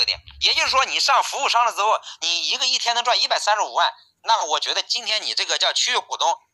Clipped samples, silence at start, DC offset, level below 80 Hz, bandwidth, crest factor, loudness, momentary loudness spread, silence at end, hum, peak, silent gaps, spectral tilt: under 0.1%; 0 s; under 0.1%; -58 dBFS; 12.5 kHz; 18 dB; -19 LUFS; 4 LU; 0.15 s; none; -2 dBFS; none; 2 dB/octave